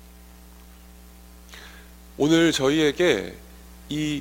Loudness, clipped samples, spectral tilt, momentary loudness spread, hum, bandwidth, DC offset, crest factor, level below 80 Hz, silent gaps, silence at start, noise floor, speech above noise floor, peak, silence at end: -22 LUFS; under 0.1%; -4.5 dB/octave; 26 LU; 60 Hz at -45 dBFS; 16.5 kHz; under 0.1%; 20 dB; -48 dBFS; none; 1.5 s; -47 dBFS; 26 dB; -6 dBFS; 0 s